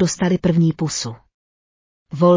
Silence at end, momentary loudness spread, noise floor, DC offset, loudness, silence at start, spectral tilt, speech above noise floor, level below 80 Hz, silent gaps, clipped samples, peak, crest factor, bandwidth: 0 s; 12 LU; under -90 dBFS; under 0.1%; -19 LUFS; 0 s; -6 dB/octave; over 73 dB; -50 dBFS; 1.34-2.06 s; under 0.1%; -4 dBFS; 14 dB; 7.6 kHz